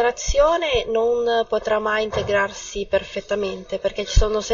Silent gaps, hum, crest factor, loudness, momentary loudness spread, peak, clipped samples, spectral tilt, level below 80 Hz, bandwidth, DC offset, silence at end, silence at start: none; none; 18 dB; -21 LUFS; 8 LU; -2 dBFS; under 0.1%; -4 dB/octave; -28 dBFS; 7.6 kHz; under 0.1%; 0 s; 0 s